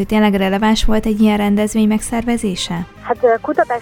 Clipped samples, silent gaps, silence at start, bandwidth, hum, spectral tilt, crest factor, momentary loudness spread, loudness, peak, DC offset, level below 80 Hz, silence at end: under 0.1%; none; 0 s; 16 kHz; none; -5.5 dB/octave; 14 dB; 7 LU; -16 LUFS; -2 dBFS; under 0.1%; -28 dBFS; 0 s